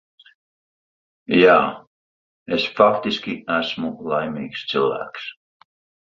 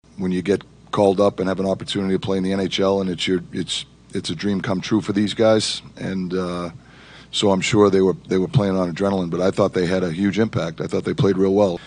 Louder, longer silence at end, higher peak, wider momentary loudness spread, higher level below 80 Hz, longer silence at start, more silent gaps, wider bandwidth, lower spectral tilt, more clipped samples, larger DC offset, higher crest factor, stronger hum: about the same, -20 LUFS vs -20 LUFS; first, 0.85 s vs 0 s; about the same, -2 dBFS vs -2 dBFS; first, 15 LU vs 9 LU; second, -60 dBFS vs -52 dBFS; first, 1.3 s vs 0.15 s; first, 1.87-2.46 s vs none; second, 7.4 kHz vs 10 kHz; about the same, -6 dB/octave vs -5.5 dB/octave; neither; neither; about the same, 20 dB vs 18 dB; neither